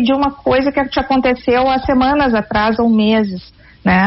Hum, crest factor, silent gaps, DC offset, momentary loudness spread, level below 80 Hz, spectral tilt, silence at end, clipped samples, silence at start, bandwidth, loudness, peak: none; 12 dB; none; under 0.1%; 4 LU; -36 dBFS; -4 dB/octave; 0 s; under 0.1%; 0 s; 6 kHz; -14 LUFS; -2 dBFS